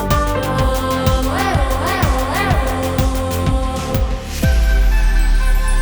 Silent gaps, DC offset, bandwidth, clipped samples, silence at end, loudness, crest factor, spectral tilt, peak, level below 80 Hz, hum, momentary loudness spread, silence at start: none; under 0.1%; over 20 kHz; under 0.1%; 0 s; -17 LUFS; 14 dB; -5.5 dB/octave; -2 dBFS; -16 dBFS; none; 3 LU; 0 s